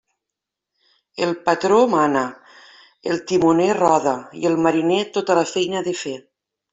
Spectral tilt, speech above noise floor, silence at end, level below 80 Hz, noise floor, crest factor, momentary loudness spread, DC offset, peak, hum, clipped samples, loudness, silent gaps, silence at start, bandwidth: -5 dB/octave; 66 dB; 0.5 s; -62 dBFS; -84 dBFS; 18 dB; 12 LU; under 0.1%; -2 dBFS; none; under 0.1%; -19 LUFS; none; 1.15 s; 8 kHz